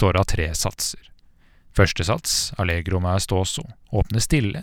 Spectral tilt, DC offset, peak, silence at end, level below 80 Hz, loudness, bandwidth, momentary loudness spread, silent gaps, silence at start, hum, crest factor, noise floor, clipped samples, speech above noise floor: -4 dB/octave; under 0.1%; -2 dBFS; 0 s; -34 dBFS; -22 LUFS; 17.5 kHz; 7 LU; none; 0 s; none; 20 dB; -53 dBFS; under 0.1%; 31 dB